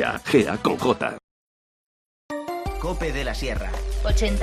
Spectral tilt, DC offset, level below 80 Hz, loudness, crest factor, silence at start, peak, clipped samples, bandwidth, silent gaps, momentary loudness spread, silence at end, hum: -5.5 dB/octave; under 0.1%; -30 dBFS; -25 LUFS; 20 dB; 0 s; -4 dBFS; under 0.1%; 14 kHz; 1.24-2.29 s; 11 LU; 0 s; none